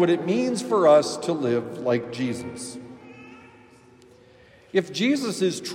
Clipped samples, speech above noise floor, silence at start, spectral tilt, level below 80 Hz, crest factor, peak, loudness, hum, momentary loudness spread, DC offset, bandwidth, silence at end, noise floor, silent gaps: under 0.1%; 30 dB; 0 s; -5 dB/octave; -70 dBFS; 18 dB; -6 dBFS; -23 LUFS; none; 22 LU; under 0.1%; 15.5 kHz; 0 s; -53 dBFS; none